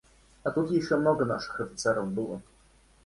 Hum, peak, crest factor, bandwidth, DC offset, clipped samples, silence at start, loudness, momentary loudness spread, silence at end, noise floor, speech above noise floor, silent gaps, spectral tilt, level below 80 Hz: none; -12 dBFS; 18 dB; 11.5 kHz; under 0.1%; under 0.1%; 0.45 s; -29 LUFS; 10 LU; 0.65 s; -60 dBFS; 32 dB; none; -5.5 dB/octave; -60 dBFS